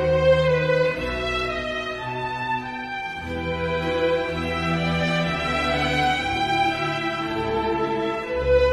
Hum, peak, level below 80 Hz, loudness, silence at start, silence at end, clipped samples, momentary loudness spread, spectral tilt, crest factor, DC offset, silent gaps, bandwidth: none; -8 dBFS; -38 dBFS; -23 LUFS; 0 s; 0 s; under 0.1%; 8 LU; -5.5 dB/octave; 16 dB; under 0.1%; none; 12.5 kHz